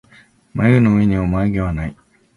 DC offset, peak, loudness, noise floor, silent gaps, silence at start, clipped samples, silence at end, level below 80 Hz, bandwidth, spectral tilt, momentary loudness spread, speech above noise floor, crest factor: under 0.1%; 0 dBFS; -16 LUFS; -50 dBFS; none; 0.55 s; under 0.1%; 0.45 s; -34 dBFS; 10.5 kHz; -9.5 dB/octave; 14 LU; 35 dB; 16 dB